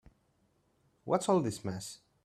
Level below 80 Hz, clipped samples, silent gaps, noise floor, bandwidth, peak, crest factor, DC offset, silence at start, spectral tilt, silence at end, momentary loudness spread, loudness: -70 dBFS; under 0.1%; none; -73 dBFS; 14.5 kHz; -14 dBFS; 22 dB; under 0.1%; 1.05 s; -5.5 dB/octave; 0.3 s; 17 LU; -33 LUFS